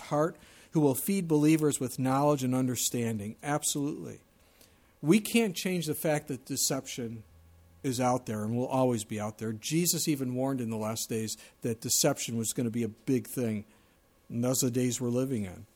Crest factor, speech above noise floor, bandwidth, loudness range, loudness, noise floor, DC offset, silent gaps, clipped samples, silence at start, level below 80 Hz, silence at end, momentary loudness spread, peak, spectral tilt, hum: 20 dB; 34 dB; 18.5 kHz; 3 LU; -30 LUFS; -64 dBFS; under 0.1%; none; under 0.1%; 0 s; -66 dBFS; 0.1 s; 10 LU; -10 dBFS; -4.5 dB/octave; none